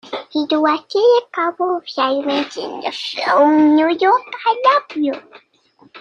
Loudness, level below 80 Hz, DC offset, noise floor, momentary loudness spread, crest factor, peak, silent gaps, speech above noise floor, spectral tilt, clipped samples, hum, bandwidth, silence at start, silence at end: -16 LUFS; -64 dBFS; under 0.1%; -46 dBFS; 11 LU; 16 dB; -2 dBFS; none; 30 dB; -4 dB/octave; under 0.1%; none; 7.4 kHz; 0.05 s; 0 s